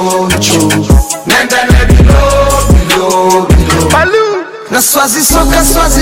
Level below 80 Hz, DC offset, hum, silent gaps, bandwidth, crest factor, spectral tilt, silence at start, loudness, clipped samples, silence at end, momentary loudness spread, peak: -12 dBFS; under 0.1%; none; none; 17 kHz; 8 dB; -4 dB/octave; 0 s; -8 LUFS; 0.8%; 0 s; 4 LU; 0 dBFS